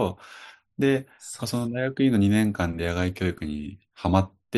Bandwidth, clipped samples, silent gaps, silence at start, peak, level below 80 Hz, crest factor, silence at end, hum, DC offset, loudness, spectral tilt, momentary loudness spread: 12.5 kHz; under 0.1%; none; 0 s; -6 dBFS; -52 dBFS; 20 dB; 0 s; none; under 0.1%; -25 LUFS; -6.5 dB/octave; 19 LU